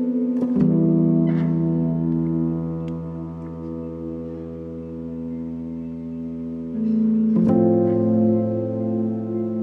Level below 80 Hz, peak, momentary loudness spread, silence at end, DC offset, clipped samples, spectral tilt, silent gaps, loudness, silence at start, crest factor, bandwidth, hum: -52 dBFS; -6 dBFS; 14 LU; 0 s; under 0.1%; under 0.1%; -12 dB/octave; none; -22 LUFS; 0 s; 14 dB; 3.3 kHz; none